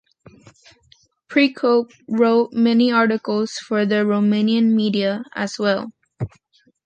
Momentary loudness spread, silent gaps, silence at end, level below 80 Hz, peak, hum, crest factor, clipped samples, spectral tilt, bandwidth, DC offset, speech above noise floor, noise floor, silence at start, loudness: 10 LU; none; 0.6 s; -58 dBFS; -4 dBFS; none; 16 dB; under 0.1%; -6 dB/octave; 8.6 kHz; under 0.1%; 41 dB; -59 dBFS; 1.3 s; -19 LUFS